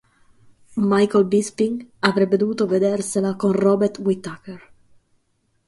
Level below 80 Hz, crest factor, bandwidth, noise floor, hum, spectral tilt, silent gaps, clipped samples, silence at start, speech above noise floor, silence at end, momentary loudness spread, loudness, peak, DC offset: -62 dBFS; 20 dB; 11.5 kHz; -68 dBFS; none; -6 dB/octave; none; under 0.1%; 0.7 s; 48 dB; 1.1 s; 10 LU; -20 LUFS; 0 dBFS; under 0.1%